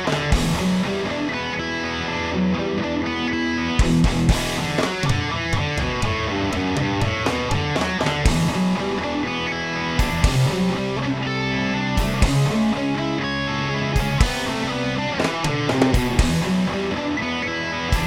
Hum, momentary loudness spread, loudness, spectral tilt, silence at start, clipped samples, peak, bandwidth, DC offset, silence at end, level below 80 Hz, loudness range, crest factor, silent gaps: none; 5 LU; -22 LUFS; -5 dB/octave; 0 s; under 0.1%; -2 dBFS; 17.5 kHz; under 0.1%; 0 s; -28 dBFS; 1 LU; 18 dB; none